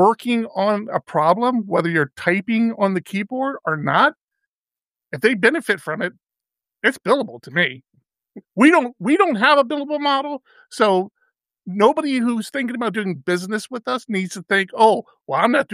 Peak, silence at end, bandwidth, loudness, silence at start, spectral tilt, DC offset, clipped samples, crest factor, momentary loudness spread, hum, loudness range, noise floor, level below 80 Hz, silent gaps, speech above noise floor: -2 dBFS; 0 s; 15 kHz; -19 LUFS; 0 s; -5.5 dB/octave; under 0.1%; under 0.1%; 18 dB; 10 LU; none; 4 LU; under -90 dBFS; -74 dBFS; 4.23-4.28 s, 4.47-4.64 s; over 71 dB